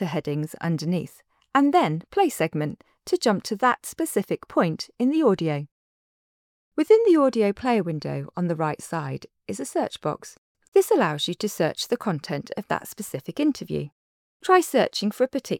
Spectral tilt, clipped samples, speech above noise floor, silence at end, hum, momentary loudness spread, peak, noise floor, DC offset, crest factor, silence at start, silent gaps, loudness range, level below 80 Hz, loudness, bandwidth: -5.5 dB/octave; under 0.1%; over 66 dB; 0 s; none; 13 LU; -6 dBFS; under -90 dBFS; under 0.1%; 18 dB; 0 s; 5.71-6.72 s, 10.38-10.55 s, 10.68-10.72 s, 13.92-14.40 s; 4 LU; -66 dBFS; -24 LUFS; 19 kHz